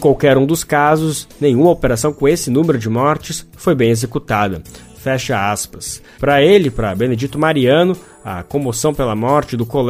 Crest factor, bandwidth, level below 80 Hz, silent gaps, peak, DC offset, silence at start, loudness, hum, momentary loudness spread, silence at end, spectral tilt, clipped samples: 14 dB; 15.5 kHz; -38 dBFS; none; 0 dBFS; under 0.1%; 0 s; -15 LUFS; none; 10 LU; 0 s; -5.5 dB/octave; under 0.1%